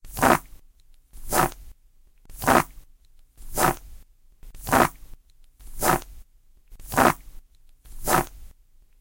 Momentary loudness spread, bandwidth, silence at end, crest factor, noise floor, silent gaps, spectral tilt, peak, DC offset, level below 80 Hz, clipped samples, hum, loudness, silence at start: 13 LU; 17 kHz; 0.55 s; 24 dB; -55 dBFS; none; -4 dB/octave; -2 dBFS; under 0.1%; -40 dBFS; under 0.1%; none; -23 LUFS; 0.05 s